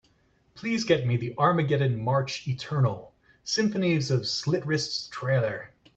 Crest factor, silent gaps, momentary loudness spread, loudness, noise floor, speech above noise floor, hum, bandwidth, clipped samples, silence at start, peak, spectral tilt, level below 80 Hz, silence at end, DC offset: 20 dB; none; 7 LU; -27 LUFS; -65 dBFS; 39 dB; none; 8.2 kHz; under 0.1%; 0.55 s; -8 dBFS; -5.5 dB/octave; -62 dBFS; 0.3 s; under 0.1%